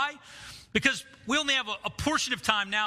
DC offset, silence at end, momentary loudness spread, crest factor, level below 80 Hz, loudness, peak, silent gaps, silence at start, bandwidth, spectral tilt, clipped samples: under 0.1%; 0 s; 15 LU; 24 dB; -54 dBFS; -27 LUFS; -6 dBFS; none; 0 s; 15.5 kHz; -2 dB/octave; under 0.1%